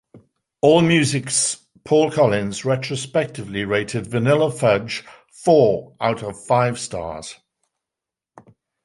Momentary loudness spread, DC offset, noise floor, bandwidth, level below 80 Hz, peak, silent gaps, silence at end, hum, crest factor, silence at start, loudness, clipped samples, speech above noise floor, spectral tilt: 13 LU; under 0.1%; -87 dBFS; 11.5 kHz; -54 dBFS; -2 dBFS; none; 1.5 s; none; 18 dB; 0.15 s; -19 LUFS; under 0.1%; 68 dB; -4.5 dB/octave